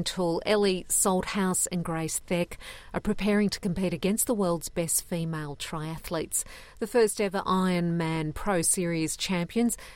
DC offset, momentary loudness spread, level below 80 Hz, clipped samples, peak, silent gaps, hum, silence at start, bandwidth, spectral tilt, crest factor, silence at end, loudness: under 0.1%; 9 LU; -48 dBFS; under 0.1%; -12 dBFS; none; none; 0 s; 16.5 kHz; -4 dB/octave; 16 dB; 0 s; -28 LUFS